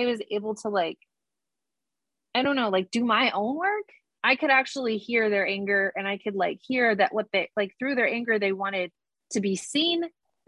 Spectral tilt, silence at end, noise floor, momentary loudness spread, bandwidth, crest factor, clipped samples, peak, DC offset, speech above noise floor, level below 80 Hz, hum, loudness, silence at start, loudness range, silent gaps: -4 dB/octave; 0.4 s; -88 dBFS; 8 LU; 11.5 kHz; 18 dB; under 0.1%; -8 dBFS; under 0.1%; 62 dB; -74 dBFS; none; -25 LUFS; 0 s; 3 LU; none